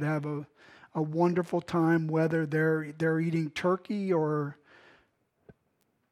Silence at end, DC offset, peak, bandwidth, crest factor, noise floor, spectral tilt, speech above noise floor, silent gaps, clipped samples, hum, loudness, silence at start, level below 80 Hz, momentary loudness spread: 1.6 s; under 0.1%; -12 dBFS; 11.5 kHz; 18 dB; -74 dBFS; -8 dB/octave; 46 dB; none; under 0.1%; none; -29 LUFS; 0 s; -72 dBFS; 10 LU